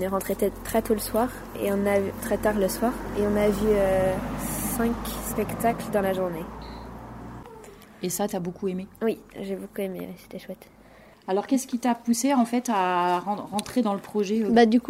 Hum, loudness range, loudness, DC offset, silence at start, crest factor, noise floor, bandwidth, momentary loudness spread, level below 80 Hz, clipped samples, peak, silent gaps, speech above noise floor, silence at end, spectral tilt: none; 7 LU; -26 LUFS; under 0.1%; 0 s; 20 dB; -51 dBFS; 16 kHz; 17 LU; -46 dBFS; under 0.1%; -6 dBFS; none; 26 dB; 0 s; -5 dB/octave